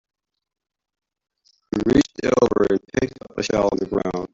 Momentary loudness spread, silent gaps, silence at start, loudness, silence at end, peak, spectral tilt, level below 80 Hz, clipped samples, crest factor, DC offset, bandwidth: 8 LU; none; 1.75 s; -21 LUFS; 0.05 s; -4 dBFS; -6 dB/octave; -46 dBFS; under 0.1%; 20 dB; under 0.1%; 7.8 kHz